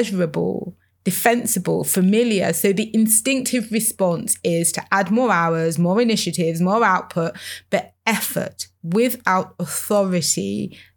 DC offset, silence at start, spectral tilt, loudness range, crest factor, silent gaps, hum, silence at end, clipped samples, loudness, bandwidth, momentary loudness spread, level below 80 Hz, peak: under 0.1%; 0 s; -4 dB/octave; 3 LU; 18 dB; none; none; 0.15 s; under 0.1%; -19 LUFS; over 20 kHz; 9 LU; -68 dBFS; 0 dBFS